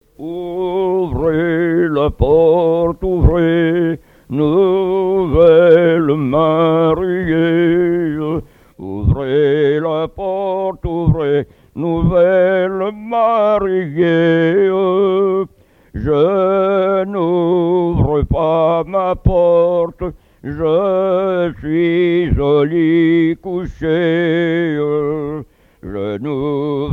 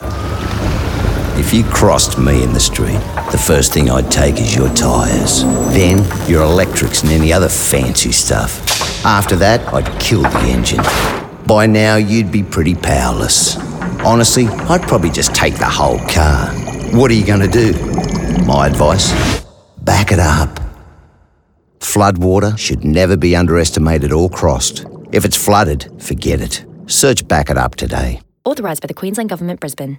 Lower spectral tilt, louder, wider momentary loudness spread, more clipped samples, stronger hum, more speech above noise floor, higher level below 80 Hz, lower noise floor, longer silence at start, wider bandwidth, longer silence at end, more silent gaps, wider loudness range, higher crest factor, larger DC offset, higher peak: first, -9.5 dB/octave vs -4.5 dB/octave; about the same, -15 LUFS vs -13 LUFS; about the same, 10 LU vs 9 LU; neither; neither; second, 29 dB vs 43 dB; second, -30 dBFS vs -22 dBFS; second, -43 dBFS vs -55 dBFS; first, 0.2 s vs 0 s; second, 4.3 kHz vs 19.5 kHz; about the same, 0 s vs 0 s; neither; about the same, 4 LU vs 3 LU; about the same, 14 dB vs 12 dB; neither; about the same, 0 dBFS vs 0 dBFS